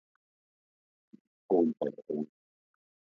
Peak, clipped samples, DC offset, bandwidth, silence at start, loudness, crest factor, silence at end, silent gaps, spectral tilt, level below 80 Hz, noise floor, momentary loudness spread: -14 dBFS; under 0.1%; under 0.1%; 3.9 kHz; 1.5 s; -32 LUFS; 22 dB; 0.9 s; none; -10 dB/octave; -84 dBFS; under -90 dBFS; 10 LU